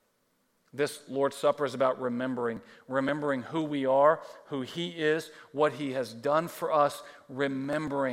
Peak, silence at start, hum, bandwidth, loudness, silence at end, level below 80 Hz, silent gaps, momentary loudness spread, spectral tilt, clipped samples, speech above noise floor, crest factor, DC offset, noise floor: -10 dBFS; 0.75 s; none; 16.5 kHz; -30 LUFS; 0 s; -74 dBFS; none; 10 LU; -5.5 dB/octave; under 0.1%; 43 dB; 20 dB; under 0.1%; -73 dBFS